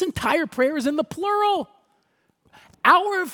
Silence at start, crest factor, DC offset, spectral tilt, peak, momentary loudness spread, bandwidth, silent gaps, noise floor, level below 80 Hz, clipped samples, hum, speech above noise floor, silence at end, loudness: 0 s; 20 dB; under 0.1%; -4 dB/octave; -2 dBFS; 8 LU; 18 kHz; none; -67 dBFS; -56 dBFS; under 0.1%; none; 47 dB; 0 s; -21 LUFS